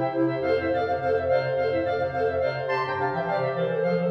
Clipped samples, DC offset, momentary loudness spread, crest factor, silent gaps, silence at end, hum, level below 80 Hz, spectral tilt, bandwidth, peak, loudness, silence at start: under 0.1%; under 0.1%; 3 LU; 12 dB; none; 0 s; none; -56 dBFS; -8 dB/octave; 6 kHz; -12 dBFS; -25 LUFS; 0 s